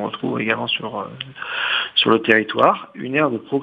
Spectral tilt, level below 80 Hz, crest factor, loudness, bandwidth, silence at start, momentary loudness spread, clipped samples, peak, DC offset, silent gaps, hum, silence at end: -6.5 dB/octave; -66 dBFS; 20 dB; -19 LUFS; 6.8 kHz; 0 s; 13 LU; under 0.1%; 0 dBFS; under 0.1%; none; none; 0 s